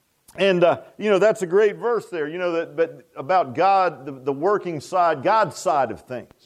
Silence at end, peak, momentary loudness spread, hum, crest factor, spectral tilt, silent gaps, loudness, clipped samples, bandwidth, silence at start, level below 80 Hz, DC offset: 0.2 s; -6 dBFS; 9 LU; none; 16 dB; -5.5 dB/octave; none; -21 LUFS; under 0.1%; 13.5 kHz; 0.35 s; -68 dBFS; under 0.1%